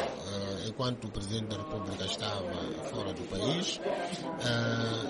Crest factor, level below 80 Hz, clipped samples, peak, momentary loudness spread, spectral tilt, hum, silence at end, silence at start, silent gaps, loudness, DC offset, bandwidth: 16 dB; -56 dBFS; under 0.1%; -18 dBFS; 6 LU; -4.5 dB/octave; none; 0 s; 0 s; none; -34 LUFS; under 0.1%; 11.5 kHz